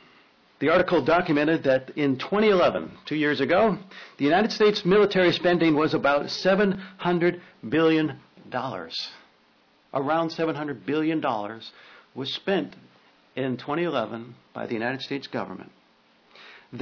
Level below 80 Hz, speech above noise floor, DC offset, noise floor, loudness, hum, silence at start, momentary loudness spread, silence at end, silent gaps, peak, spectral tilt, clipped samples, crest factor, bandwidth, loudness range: -60 dBFS; 37 dB; under 0.1%; -61 dBFS; -24 LUFS; none; 0.6 s; 16 LU; 0 s; none; -12 dBFS; -6.5 dB/octave; under 0.1%; 12 dB; 5.4 kHz; 9 LU